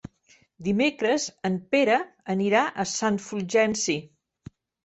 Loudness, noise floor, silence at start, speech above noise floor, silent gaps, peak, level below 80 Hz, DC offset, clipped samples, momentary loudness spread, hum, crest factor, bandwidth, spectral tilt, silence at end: -25 LUFS; -61 dBFS; 0.6 s; 37 dB; none; -8 dBFS; -62 dBFS; under 0.1%; under 0.1%; 7 LU; none; 18 dB; 8.4 kHz; -4 dB/octave; 0.8 s